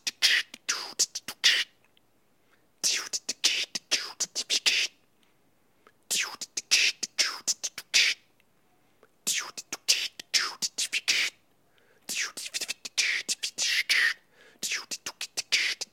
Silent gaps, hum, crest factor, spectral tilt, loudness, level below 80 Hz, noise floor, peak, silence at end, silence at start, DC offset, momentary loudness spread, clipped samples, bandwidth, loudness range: none; none; 24 dB; 3 dB/octave; -27 LUFS; -84 dBFS; -69 dBFS; -6 dBFS; 0.1 s; 0.05 s; under 0.1%; 11 LU; under 0.1%; 16.5 kHz; 2 LU